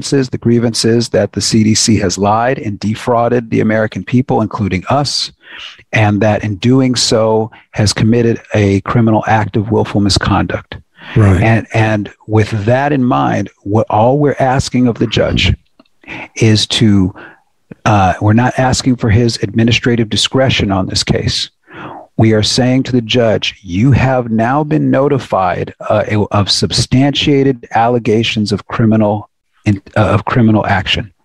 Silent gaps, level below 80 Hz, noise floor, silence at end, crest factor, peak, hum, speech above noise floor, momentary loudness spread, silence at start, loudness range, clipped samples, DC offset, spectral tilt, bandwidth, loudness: none; -36 dBFS; -39 dBFS; 0.15 s; 12 dB; 0 dBFS; none; 27 dB; 7 LU; 0 s; 2 LU; under 0.1%; 0.3%; -5.5 dB/octave; 12 kHz; -12 LUFS